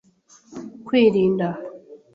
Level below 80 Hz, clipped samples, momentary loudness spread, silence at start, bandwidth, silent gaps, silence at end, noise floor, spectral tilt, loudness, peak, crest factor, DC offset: -62 dBFS; under 0.1%; 21 LU; 0.5 s; 7.6 kHz; none; 0.2 s; -54 dBFS; -7.5 dB/octave; -19 LUFS; -6 dBFS; 18 dB; under 0.1%